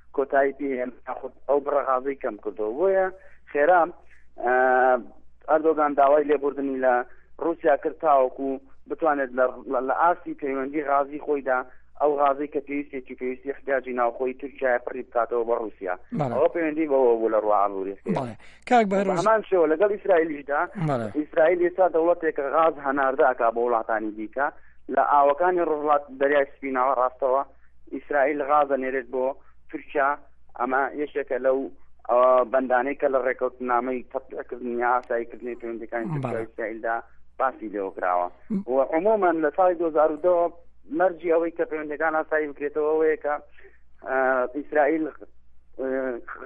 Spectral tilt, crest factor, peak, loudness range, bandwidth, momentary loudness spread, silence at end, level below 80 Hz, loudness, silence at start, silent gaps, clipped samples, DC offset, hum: -7.5 dB/octave; 16 dB; -8 dBFS; 5 LU; 8.6 kHz; 11 LU; 0 s; -58 dBFS; -24 LUFS; 0.05 s; none; under 0.1%; under 0.1%; none